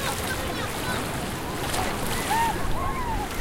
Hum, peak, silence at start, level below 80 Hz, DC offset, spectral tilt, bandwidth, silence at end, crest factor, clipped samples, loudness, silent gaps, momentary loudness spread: none; -12 dBFS; 0 s; -36 dBFS; under 0.1%; -3.5 dB/octave; 17 kHz; 0 s; 16 dB; under 0.1%; -27 LUFS; none; 5 LU